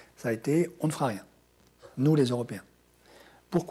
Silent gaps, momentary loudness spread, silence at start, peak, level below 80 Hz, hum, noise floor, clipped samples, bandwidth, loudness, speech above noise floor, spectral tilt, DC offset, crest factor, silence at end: none; 16 LU; 0.2 s; -14 dBFS; -66 dBFS; none; -62 dBFS; under 0.1%; 15.5 kHz; -29 LUFS; 35 dB; -7 dB/octave; under 0.1%; 16 dB; 0 s